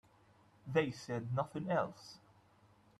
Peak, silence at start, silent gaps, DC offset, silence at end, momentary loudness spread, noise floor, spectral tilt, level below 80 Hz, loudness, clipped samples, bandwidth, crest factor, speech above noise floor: -20 dBFS; 0.65 s; none; under 0.1%; 0.8 s; 20 LU; -67 dBFS; -6.5 dB/octave; -74 dBFS; -38 LUFS; under 0.1%; 12.5 kHz; 22 dB; 30 dB